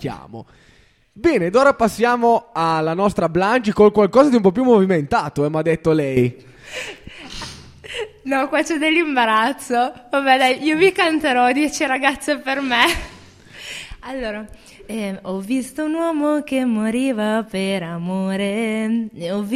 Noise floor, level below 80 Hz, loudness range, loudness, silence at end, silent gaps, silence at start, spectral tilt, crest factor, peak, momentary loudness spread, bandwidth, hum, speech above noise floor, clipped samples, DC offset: -42 dBFS; -46 dBFS; 7 LU; -18 LUFS; 0 s; none; 0 s; -5 dB/octave; 18 dB; 0 dBFS; 17 LU; 15.5 kHz; none; 24 dB; under 0.1%; under 0.1%